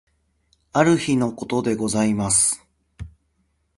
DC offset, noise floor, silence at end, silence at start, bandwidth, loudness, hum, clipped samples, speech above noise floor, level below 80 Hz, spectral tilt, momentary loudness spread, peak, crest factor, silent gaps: under 0.1%; -68 dBFS; 0.7 s; 0.75 s; 11.5 kHz; -20 LUFS; none; under 0.1%; 48 dB; -50 dBFS; -4 dB/octave; 24 LU; -2 dBFS; 20 dB; none